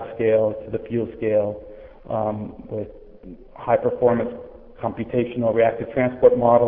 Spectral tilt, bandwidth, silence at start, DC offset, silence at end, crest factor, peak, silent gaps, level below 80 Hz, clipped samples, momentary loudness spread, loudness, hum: -11.5 dB/octave; 3.7 kHz; 0 s; under 0.1%; 0 s; 20 dB; -2 dBFS; none; -50 dBFS; under 0.1%; 15 LU; -22 LUFS; none